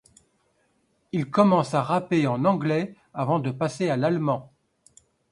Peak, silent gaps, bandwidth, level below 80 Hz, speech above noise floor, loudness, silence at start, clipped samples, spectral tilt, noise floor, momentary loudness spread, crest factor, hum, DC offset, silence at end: -6 dBFS; none; 11 kHz; -66 dBFS; 45 dB; -24 LUFS; 1.15 s; under 0.1%; -7.5 dB/octave; -69 dBFS; 11 LU; 20 dB; none; under 0.1%; 0.85 s